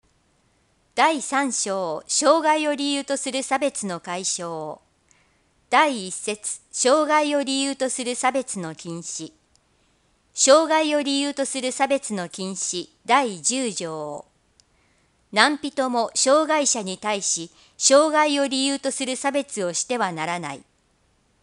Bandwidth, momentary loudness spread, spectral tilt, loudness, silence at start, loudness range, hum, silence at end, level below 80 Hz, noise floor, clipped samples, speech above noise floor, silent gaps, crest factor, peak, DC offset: 11.5 kHz; 13 LU; -2 dB/octave; -22 LUFS; 0.95 s; 5 LU; none; 0.85 s; -70 dBFS; -64 dBFS; under 0.1%; 42 dB; none; 24 dB; 0 dBFS; under 0.1%